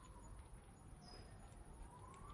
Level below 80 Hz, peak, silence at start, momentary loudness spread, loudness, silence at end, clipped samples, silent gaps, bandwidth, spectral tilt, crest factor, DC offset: -62 dBFS; -44 dBFS; 0 s; 3 LU; -60 LUFS; 0 s; under 0.1%; none; 11.5 kHz; -5 dB/octave; 14 dB; under 0.1%